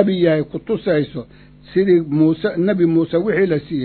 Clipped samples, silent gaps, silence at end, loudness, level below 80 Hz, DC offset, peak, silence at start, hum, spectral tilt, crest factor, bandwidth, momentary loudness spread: under 0.1%; none; 0 s; -17 LUFS; -50 dBFS; under 0.1%; 0 dBFS; 0 s; none; -12 dB/octave; 16 dB; 4.5 kHz; 7 LU